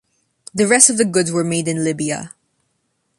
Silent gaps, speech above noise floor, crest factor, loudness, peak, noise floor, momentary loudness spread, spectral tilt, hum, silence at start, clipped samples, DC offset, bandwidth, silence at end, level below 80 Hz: none; 52 dB; 18 dB; -16 LUFS; 0 dBFS; -69 dBFS; 17 LU; -3.5 dB/octave; none; 0.55 s; under 0.1%; under 0.1%; 16 kHz; 0.9 s; -60 dBFS